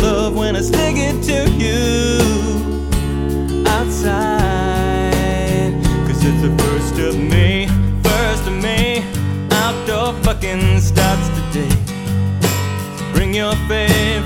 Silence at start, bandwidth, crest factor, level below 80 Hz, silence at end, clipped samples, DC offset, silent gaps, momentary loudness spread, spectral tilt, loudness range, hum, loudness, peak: 0 s; 17 kHz; 14 dB; -22 dBFS; 0 s; under 0.1%; under 0.1%; none; 5 LU; -5.5 dB/octave; 1 LU; none; -16 LUFS; 0 dBFS